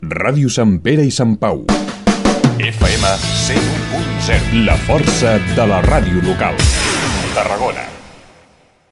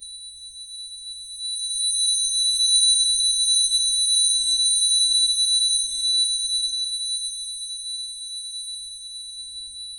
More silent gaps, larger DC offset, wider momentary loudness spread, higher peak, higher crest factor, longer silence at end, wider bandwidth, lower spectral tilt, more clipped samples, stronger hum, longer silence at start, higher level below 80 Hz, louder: neither; neither; second, 5 LU vs 17 LU; first, 0 dBFS vs -6 dBFS; about the same, 14 dB vs 16 dB; first, 0.8 s vs 0 s; second, 11.5 kHz vs 13.5 kHz; first, -5 dB/octave vs 5 dB/octave; neither; neither; about the same, 0 s vs 0 s; first, -24 dBFS vs -58 dBFS; first, -14 LUFS vs -18 LUFS